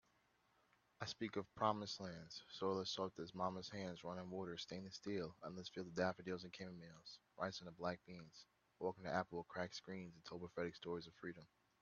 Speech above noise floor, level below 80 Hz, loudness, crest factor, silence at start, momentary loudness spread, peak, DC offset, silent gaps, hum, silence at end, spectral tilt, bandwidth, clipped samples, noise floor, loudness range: 32 dB; -80 dBFS; -48 LUFS; 26 dB; 1 s; 11 LU; -22 dBFS; under 0.1%; none; none; 0.35 s; -4 dB/octave; 7 kHz; under 0.1%; -79 dBFS; 3 LU